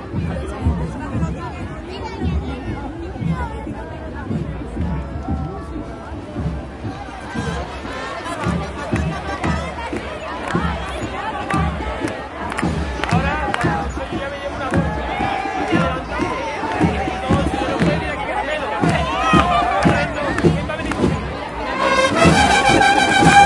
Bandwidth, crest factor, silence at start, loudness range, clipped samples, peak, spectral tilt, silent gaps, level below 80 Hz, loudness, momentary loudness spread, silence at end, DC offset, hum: 11.5 kHz; 20 dB; 0 s; 10 LU; under 0.1%; 0 dBFS; -5.5 dB/octave; none; -32 dBFS; -20 LUFS; 14 LU; 0 s; under 0.1%; none